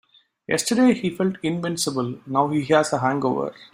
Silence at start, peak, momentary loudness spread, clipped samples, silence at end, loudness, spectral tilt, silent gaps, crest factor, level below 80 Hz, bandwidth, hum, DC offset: 0.5 s; -4 dBFS; 7 LU; under 0.1%; 0.1 s; -22 LUFS; -5 dB/octave; none; 20 dB; -62 dBFS; 16 kHz; none; under 0.1%